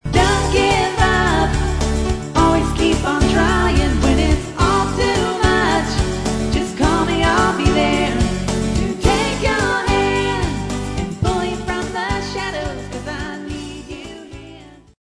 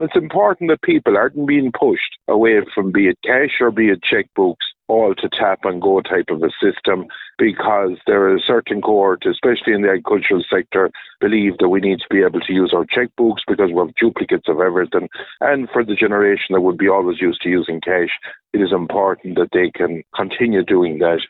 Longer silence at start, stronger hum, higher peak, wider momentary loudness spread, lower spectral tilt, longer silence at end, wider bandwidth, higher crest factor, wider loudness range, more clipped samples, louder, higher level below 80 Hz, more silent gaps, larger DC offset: about the same, 0.05 s vs 0 s; neither; about the same, 0 dBFS vs 0 dBFS; first, 12 LU vs 5 LU; second, -5 dB/octave vs -9.5 dB/octave; first, 0.35 s vs 0.05 s; first, 11 kHz vs 4.1 kHz; about the same, 16 dB vs 16 dB; first, 7 LU vs 2 LU; neither; about the same, -17 LUFS vs -16 LUFS; first, -24 dBFS vs -56 dBFS; neither; neither